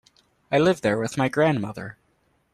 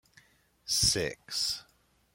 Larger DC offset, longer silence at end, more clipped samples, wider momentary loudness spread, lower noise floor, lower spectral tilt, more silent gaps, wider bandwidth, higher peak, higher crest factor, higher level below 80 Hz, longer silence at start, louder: neither; about the same, 0.6 s vs 0.5 s; neither; about the same, 14 LU vs 13 LU; about the same, -67 dBFS vs -68 dBFS; first, -6 dB/octave vs -1.5 dB/octave; neither; second, 13.5 kHz vs 16.5 kHz; first, -6 dBFS vs -12 dBFS; about the same, 18 dB vs 22 dB; second, -60 dBFS vs -54 dBFS; second, 0.5 s vs 0.65 s; first, -23 LUFS vs -29 LUFS